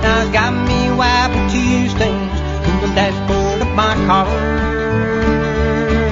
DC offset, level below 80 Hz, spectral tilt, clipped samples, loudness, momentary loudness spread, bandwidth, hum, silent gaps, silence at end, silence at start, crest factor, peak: under 0.1%; -24 dBFS; -6 dB/octave; under 0.1%; -15 LUFS; 4 LU; 7.8 kHz; none; none; 0 s; 0 s; 14 dB; 0 dBFS